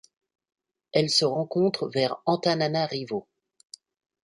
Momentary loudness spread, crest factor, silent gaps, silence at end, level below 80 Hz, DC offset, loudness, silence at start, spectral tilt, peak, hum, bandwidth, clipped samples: 8 LU; 20 dB; none; 1 s; -70 dBFS; under 0.1%; -25 LUFS; 0.95 s; -4.5 dB/octave; -8 dBFS; none; 11.5 kHz; under 0.1%